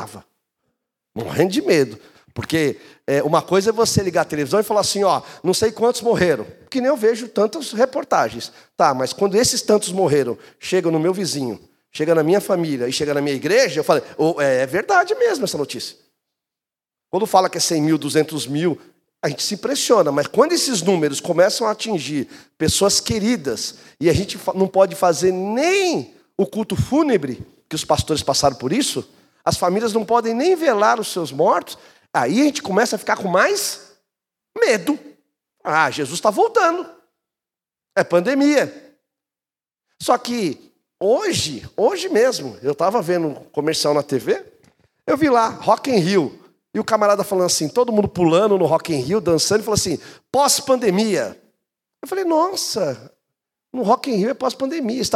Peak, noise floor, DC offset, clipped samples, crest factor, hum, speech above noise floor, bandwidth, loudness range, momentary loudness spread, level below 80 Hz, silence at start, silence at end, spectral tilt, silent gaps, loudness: 0 dBFS; under -90 dBFS; under 0.1%; under 0.1%; 18 dB; none; over 72 dB; 16 kHz; 3 LU; 10 LU; -52 dBFS; 0 s; 0 s; -4 dB/octave; none; -19 LUFS